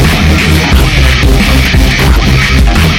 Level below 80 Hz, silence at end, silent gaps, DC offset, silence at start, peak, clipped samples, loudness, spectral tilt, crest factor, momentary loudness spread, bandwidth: -10 dBFS; 0 s; none; under 0.1%; 0 s; 0 dBFS; 0.5%; -7 LUFS; -5 dB/octave; 6 dB; 0 LU; 17 kHz